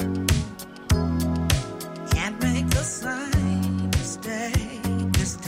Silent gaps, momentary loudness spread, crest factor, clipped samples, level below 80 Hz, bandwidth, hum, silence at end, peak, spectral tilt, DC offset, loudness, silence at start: none; 6 LU; 22 dB; under 0.1%; -34 dBFS; 16 kHz; none; 0 s; -2 dBFS; -5 dB/octave; under 0.1%; -25 LUFS; 0 s